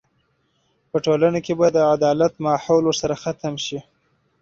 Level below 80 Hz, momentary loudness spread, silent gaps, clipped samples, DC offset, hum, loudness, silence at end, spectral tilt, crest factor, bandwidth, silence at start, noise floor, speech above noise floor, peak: -56 dBFS; 10 LU; none; under 0.1%; under 0.1%; none; -20 LUFS; 0.6 s; -5.5 dB/octave; 16 dB; 7.8 kHz; 0.95 s; -66 dBFS; 47 dB; -4 dBFS